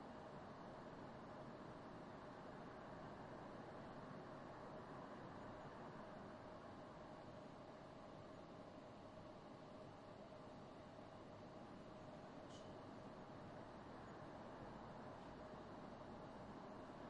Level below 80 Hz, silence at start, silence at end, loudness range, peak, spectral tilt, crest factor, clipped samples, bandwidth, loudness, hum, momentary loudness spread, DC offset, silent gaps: -74 dBFS; 0 s; 0 s; 3 LU; -42 dBFS; -6.5 dB/octave; 14 dB; under 0.1%; 10 kHz; -57 LUFS; none; 3 LU; under 0.1%; none